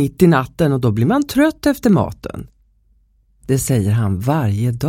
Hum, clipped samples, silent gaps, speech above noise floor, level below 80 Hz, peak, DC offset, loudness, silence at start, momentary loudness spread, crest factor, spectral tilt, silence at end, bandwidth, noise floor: none; under 0.1%; none; 41 dB; -42 dBFS; 0 dBFS; under 0.1%; -16 LUFS; 0 s; 12 LU; 16 dB; -7 dB/octave; 0 s; 17 kHz; -56 dBFS